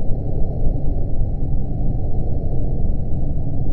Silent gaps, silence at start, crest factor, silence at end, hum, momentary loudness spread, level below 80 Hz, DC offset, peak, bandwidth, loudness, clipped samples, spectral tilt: none; 0 s; 12 dB; 0 s; none; 1 LU; -20 dBFS; under 0.1%; -4 dBFS; 0.9 kHz; -25 LUFS; under 0.1%; -13.5 dB/octave